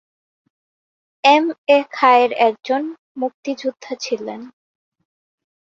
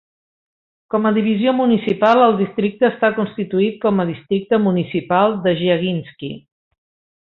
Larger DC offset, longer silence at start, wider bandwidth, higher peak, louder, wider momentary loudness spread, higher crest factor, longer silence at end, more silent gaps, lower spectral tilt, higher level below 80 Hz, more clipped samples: neither; first, 1.25 s vs 0.95 s; first, 7.8 kHz vs 5.6 kHz; about the same, -2 dBFS vs -2 dBFS; about the same, -17 LUFS vs -17 LUFS; first, 14 LU vs 9 LU; about the same, 18 dB vs 16 dB; first, 1.3 s vs 0.85 s; first, 1.58-1.67 s, 2.99-3.15 s, 3.34-3.43 s vs none; second, -3 dB/octave vs -8.5 dB/octave; second, -72 dBFS vs -58 dBFS; neither